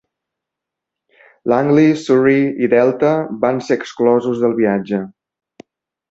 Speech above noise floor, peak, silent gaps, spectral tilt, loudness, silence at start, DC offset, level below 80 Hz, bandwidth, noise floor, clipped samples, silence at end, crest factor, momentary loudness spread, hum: 68 dB; -2 dBFS; none; -7.5 dB/octave; -15 LUFS; 1.45 s; under 0.1%; -60 dBFS; 8 kHz; -83 dBFS; under 0.1%; 1 s; 16 dB; 8 LU; none